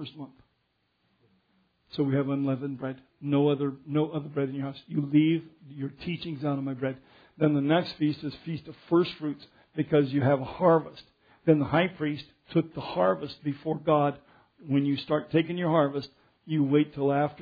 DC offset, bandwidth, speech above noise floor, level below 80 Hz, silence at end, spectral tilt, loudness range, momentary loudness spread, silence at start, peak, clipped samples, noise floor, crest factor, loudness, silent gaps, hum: under 0.1%; 5 kHz; 47 dB; -64 dBFS; 0 s; -9.5 dB/octave; 3 LU; 14 LU; 0 s; -8 dBFS; under 0.1%; -74 dBFS; 20 dB; -28 LUFS; none; none